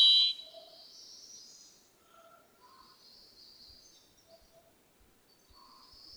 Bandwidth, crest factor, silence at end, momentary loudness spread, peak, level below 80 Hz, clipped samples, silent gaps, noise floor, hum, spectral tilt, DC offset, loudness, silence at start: over 20 kHz; 22 dB; 5.75 s; 30 LU; -14 dBFS; -76 dBFS; under 0.1%; none; -66 dBFS; none; 1.5 dB/octave; under 0.1%; -25 LUFS; 0 s